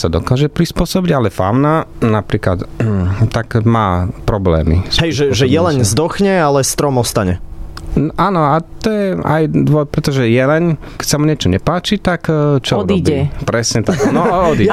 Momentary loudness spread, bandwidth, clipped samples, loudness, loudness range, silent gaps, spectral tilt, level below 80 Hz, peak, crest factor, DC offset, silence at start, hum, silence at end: 5 LU; 15.5 kHz; under 0.1%; -14 LUFS; 2 LU; none; -5.5 dB/octave; -30 dBFS; -2 dBFS; 12 dB; under 0.1%; 0 s; none; 0 s